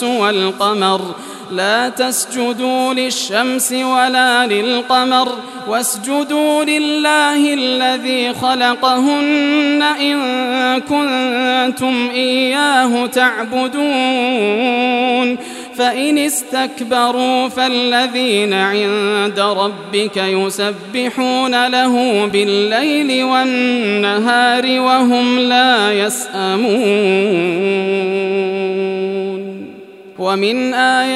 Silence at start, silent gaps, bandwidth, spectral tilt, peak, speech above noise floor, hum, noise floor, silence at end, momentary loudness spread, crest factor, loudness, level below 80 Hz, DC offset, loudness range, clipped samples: 0 s; none; 15.5 kHz; -3 dB/octave; 0 dBFS; 21 dB; none; -35 dBFS; 0 s; 6 LU; 14 dB; -14 LUFS; -66 dBFS; under 0.1%; 3 LU; under 0.1%